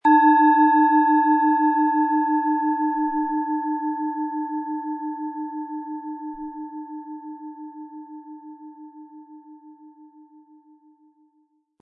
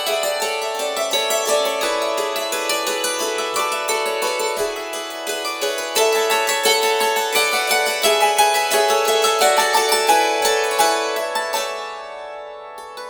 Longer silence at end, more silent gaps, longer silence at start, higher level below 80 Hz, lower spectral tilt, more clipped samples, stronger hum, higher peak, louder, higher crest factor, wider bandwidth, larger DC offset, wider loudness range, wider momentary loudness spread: first, 1.75 s vs 0 s; neither; about the same, 0.05 s vs 0 s; second, -70 dBFS vs -60 dBFS; first, -7 dB/octave vs 1 dB/octave; neither; neither; second, -6 dBFS vs -2 dBFS; second, -21 LUFS vs -18 LUFS; about the same, 16 dB vs 16 dB; second, 3.9 kHz vs over 20 kHz; neither; first, 23 LU vs 5 LU; first, 24 LU vs 11 LU